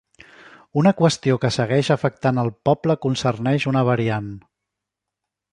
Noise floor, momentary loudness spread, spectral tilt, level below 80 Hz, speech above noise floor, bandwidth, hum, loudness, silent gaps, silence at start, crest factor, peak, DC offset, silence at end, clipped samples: -84 dBFS; 4 LU; -6.5 dB/octave; -56 dBFS; 64 dB; 10.5 kHz; none; -20 LUFS; none; 0.75 s; 18 dB; -4 dBFS; under 0.1%; 1.15 s; under 0.1%